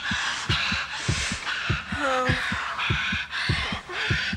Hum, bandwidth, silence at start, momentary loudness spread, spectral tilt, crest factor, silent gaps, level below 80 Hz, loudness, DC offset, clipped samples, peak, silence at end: none; 13.5 kHz; 0 s; 4 LU; -3.5 dB/octave; 16 dB; none; -40 dBFS; -26 LUFS; under 0.1%; under 0.1%; -10 dBFS; 0 s